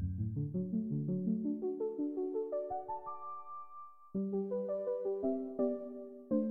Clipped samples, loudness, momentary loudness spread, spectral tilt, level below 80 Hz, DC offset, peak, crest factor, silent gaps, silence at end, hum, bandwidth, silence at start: under 0.1%; -38 LUFS; 11 LU; -13.5 dB/octave; -62 dBFS; under 0.1%; -22 dBFS; 16 dB; none; 0 s; none; 2.5 kHz; 0 s